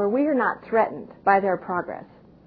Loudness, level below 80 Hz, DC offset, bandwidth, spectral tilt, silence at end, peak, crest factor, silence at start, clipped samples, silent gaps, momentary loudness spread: -23 LUFS; -62 dBFS; under 0.1%; 5 kHz; -10 dB/octave; 0.4 s; -4 dBFS; 20 dB; 0 s; under 0.1%; none; 9 LU